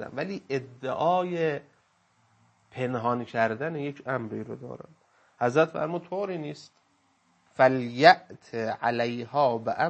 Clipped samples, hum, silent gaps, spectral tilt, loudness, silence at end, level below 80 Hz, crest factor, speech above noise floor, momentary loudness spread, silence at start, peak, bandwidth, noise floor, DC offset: under 0.1%; none; none; -6 dB/octave; -27 LUFS; 0 s; -74 dBFS; 26 dB; 41 dB; 16 LU; 0 s; -2 dBFS; 8.6 kHz; -68 dBFS; under 0.1%